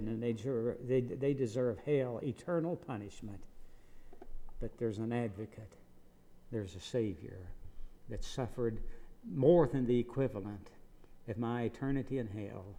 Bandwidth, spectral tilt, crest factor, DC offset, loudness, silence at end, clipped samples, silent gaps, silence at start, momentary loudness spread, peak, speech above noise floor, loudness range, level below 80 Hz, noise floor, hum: 11.5 kHz; -8 dB/octave; 22 dB; under 0.1%; -36 LUFS; 0 s; under 0.1%; none; 0 s; 20 LU; -14 dBFS; 22 dB; 9 LU; -50 dBFS; -58 dBFS; none